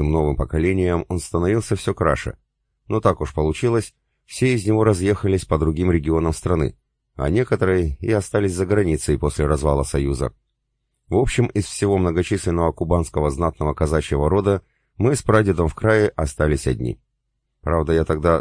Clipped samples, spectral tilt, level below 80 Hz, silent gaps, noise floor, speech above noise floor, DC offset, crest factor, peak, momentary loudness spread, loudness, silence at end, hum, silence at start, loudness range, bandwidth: under 0.1%; -6.5 dB/octave; -32 dBFS; none; -74 dBFS; 54 dB; under 0.1%; 20 dB; 0 dBFS; 6 LU; -20 LUFS; 0 s; none; 0 s; 2 LU; 10.5 kHz